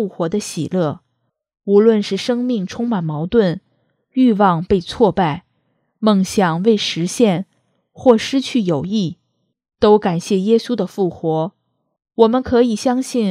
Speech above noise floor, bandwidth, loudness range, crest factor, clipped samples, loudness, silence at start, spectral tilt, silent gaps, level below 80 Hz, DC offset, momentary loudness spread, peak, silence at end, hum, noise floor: 55 dB; 14.5 kHz; 2 LU; 18 dB; under 0.1%; -17 LUFS; 0 s; -6 dB/octave; none; -48 dBFS; under 0.1%; 9 LU; 0 dBFS; 0 s; none; -70 dBFS